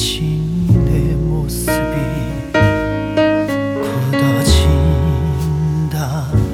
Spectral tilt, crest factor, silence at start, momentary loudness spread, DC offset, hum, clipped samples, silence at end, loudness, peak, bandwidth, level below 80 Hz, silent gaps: -6 dB/octave; 14 dB; 0 s; 6 LU; under 0.1%; none; under 0.1%; 0 s; -16 LUFS; 0 dBFS; 16.5 kHz; -22 dBFS; none